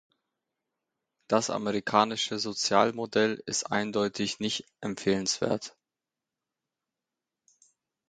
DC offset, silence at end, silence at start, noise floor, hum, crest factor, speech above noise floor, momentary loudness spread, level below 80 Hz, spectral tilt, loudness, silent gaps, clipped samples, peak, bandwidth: under 0.1%; 2.4 s; 1.3 s; -89 dBFS; none; 24 dB; 61 dB; 7 LU; -68 dBFS; -3.5 dB/octave; -28 LUFS; none; under 0.1%; -6 dBFS; 9.4 kHz